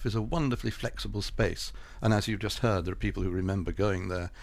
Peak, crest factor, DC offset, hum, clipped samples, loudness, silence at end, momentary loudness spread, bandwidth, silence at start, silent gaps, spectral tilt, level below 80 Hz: -14 dBFS; 16 dB; under 0.1%; none; under 0.1%; -31 LUFS; 0 s; 7 LU; 15 kHz; 0 s; none; -6 dB/octave; -40 dBFS